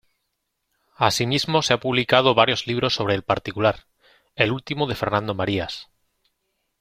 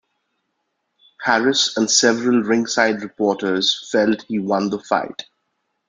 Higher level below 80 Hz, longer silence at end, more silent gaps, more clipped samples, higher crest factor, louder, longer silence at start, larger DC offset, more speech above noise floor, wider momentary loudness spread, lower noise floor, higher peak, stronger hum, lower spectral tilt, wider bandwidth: first, -54 dBFS vs -64 dBFS; first, 0.95 s vs 0.65 s; neither; neither; about the same, 22 dB vs 18 dB; second, -21 LUFS vs -18 LUFS; second, 1 s vs 1.2 s; neither; about the same, 55 dB vs 55 dB; about the same, 9 LU vs 7 LU; about the same, -76 dBFS vs -73 dBFS; about the same, -2 dBFS vs -2 dBFS; neither; first, -4.5 dB/octave vs -2.5 dB/octave; first, 16 kHz vs 9.6 kHz